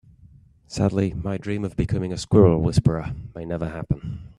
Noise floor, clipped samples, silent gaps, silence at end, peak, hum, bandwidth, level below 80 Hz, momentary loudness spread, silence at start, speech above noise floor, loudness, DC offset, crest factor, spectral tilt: -51 dBFS; under 0.1%; none; 0.05 s; -2 dBFS; none; 11 kHz; -40 dBFS; 14 LU; 0.7 s; 29 dB; -23 LUFS; under 0.1%; 20 dB; -7.5 dB/octave